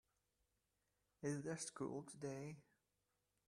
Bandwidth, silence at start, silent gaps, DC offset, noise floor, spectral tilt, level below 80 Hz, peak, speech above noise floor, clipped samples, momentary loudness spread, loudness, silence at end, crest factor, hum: 13.5 kHz; 1.2 s; none; under 0.1%; -88 dBFS; -5 dB/octave; -84 dBFS; -32 dBFS; 40 dB; under 0.1%; 8 LU; -49 LUFS; 0.9 s; 20 dB; none